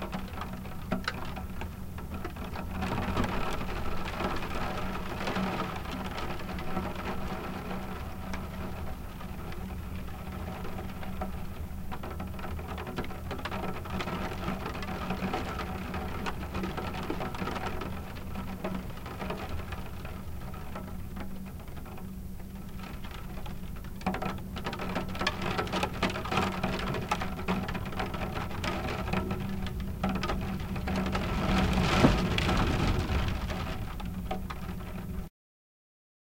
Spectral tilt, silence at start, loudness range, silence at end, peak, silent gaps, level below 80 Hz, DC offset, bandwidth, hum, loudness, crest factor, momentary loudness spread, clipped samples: -6 dB/octave; 0 s; 11 LU; 1 s; -8 dBFS; none; -40 dBFS; under 0.1%; 17 kHz; none; -35 LUFS; 26 dB; 11 LU; under 0.1%